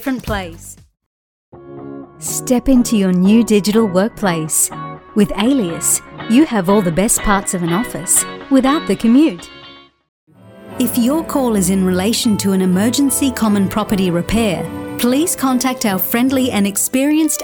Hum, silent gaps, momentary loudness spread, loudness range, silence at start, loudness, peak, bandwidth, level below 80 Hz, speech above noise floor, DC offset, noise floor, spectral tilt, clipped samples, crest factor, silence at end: none; 1.06-1.52 s, 10.09-10.27 s; 9 LU; 3 LU; 0 s; -15 LUFS; 0 dBFS; 19.5 kHz; -36 dBFS; 26 dB; under 0.1%; -41 dBFS; -4.5 dB/octave; under 0.1%; 14 dB; 0 s